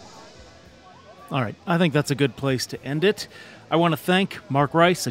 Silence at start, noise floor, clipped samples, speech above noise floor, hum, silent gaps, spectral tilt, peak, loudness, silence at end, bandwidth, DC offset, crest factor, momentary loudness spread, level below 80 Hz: 0 s; -48 dBFS; under 0.1%; 26 dB; none; none; -5.5 dB/octave; -2 dBFS; -23 LUFS; 0 s; 16 kHz; under 0.1%; 22 dB; 9 LU; -58 dBFS